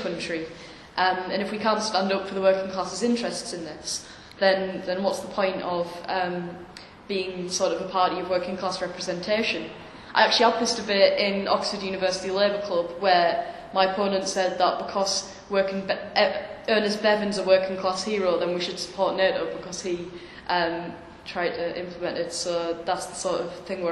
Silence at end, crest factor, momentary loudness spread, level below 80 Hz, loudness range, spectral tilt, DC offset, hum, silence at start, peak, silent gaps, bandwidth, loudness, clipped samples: 0 s; 24 dB; 11 LU; -60 dBFS; 5 LU; -3.5 dB/octave; under 0.1%; none; 0 s; -2 dBFS; none; 12 kHz; -25 LUFS; under 0.1%